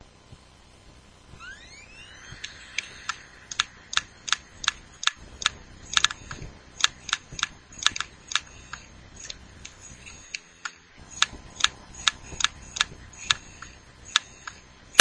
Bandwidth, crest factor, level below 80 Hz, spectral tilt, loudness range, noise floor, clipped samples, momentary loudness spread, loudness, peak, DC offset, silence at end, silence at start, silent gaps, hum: 11 kHz; 30 dB; -52 dBFS; 0.5 dB/octave; 8 LU; -53 dBFS; under 0.1%; 19 LU; -27 LUFS; 0 dBFS; under 0.1%; 0 s; 0.3 s; none; none